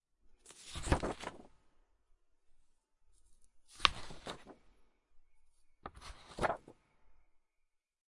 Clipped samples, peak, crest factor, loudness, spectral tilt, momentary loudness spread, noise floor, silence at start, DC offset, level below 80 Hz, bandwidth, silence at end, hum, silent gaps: under 0.1%; -2 dBFS; 42 dB; -38 LUFS; -3.5 dB/octave; 22 LU; -80 dBFS; 0.3 s; under 0.1%; -54 dBFS; 11.5 kHz; 0.95 s; none; none